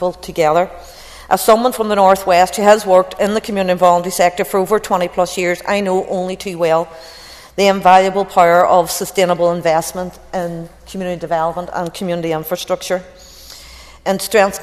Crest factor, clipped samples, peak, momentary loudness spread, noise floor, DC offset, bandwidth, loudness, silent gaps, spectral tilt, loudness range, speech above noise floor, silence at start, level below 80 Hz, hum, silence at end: 16 dB; 0.1%; 0 dBFS; 16 LU; -38 dBFS; under 0.1%; 14.5 kHz; -15 LUFS; none; -4 dB/octave; 8 LU; 23 dB; 0 s; -46 dBFS; none; 0 s